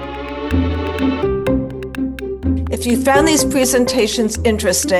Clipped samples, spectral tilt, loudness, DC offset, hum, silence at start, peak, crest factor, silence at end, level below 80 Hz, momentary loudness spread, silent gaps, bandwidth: under 0.1%; -4 dB/octave; -17 LUFS; under 0.1%; none; 0 s; 0 dBFS; 16 dB; 0 s; -30 dBFS; 11 LU; none; 19 kHz